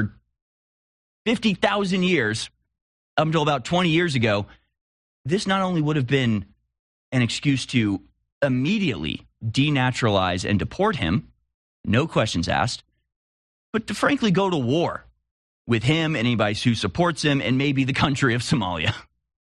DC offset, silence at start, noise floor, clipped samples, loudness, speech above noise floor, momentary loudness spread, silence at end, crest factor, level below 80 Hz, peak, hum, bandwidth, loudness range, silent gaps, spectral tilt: under 0.1%; 0 s; under -90 dBFS; under 0.1%; -22 LUFS; over 68 dB; 8 LU; 0.45 s; 18 dB; -52 dBFS; -4 dBFS; none; 11.5 kHz; 3 LU; 0.42-1.25 s, 2.82-3.17 s, 4.81-5.24 s, 6.79-7.12 s, 8.32-8.41 s, 11.54-11.84 s, 13.16-13.73 s, 15.31-15.65 s; -5.5 dB/octave